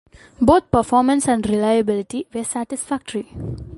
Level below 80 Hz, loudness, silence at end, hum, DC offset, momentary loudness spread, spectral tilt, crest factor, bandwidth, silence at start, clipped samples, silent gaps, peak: -42 dBFS; -19 LUFS; 0 s; none; under 0.1%; 12 LU; -5.5 dB/octave; 18 dB; 11.5 kHz; 0.4 s; under 0.1%; none; 0 dBFS